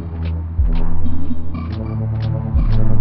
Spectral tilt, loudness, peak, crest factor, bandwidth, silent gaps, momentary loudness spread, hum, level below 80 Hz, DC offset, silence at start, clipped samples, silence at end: -11 dB/octave; -22 LUFS; -2 dBFS; 12 dB; 4.5 kHz; none; 7 LU; none; -18 dBFS; under 0.1%; 0 s; under 0.1%; 0 s